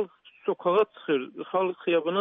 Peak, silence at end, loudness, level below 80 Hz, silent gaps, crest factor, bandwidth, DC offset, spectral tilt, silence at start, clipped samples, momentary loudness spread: -10 dBFS; 0 s; -27 LUFS; -86 dBFS; none; 16 dB; 3.9 kHz; under 0.1%; -3.5 dB/octave; 0 s; under 0.1%; 8 LU